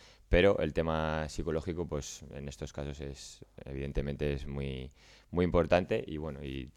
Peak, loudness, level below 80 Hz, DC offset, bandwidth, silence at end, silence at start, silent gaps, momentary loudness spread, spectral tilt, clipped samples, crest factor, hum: -12 dBFS; -33 LUFS; -44 dBFS; under 0.1%; 14 kHz; 0.05 s; 0 s; none; 17 LU; -6 dB/octave; under 0.1%; 22 dB; none